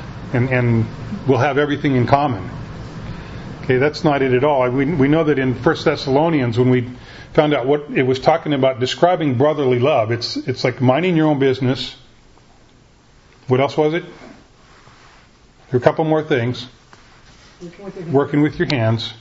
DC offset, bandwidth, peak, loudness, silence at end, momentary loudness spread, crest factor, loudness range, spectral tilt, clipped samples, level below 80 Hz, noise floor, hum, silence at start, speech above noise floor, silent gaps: under 0.1%; 8 kHz; 0 dBFS; -17 LUFS; 0.05 s; 16 LU; 18 dB; 6 LU; -7 dB/octave; under 0.1%; -44 dBFS; -49 dBFS; none; 0 s; 33 dB; none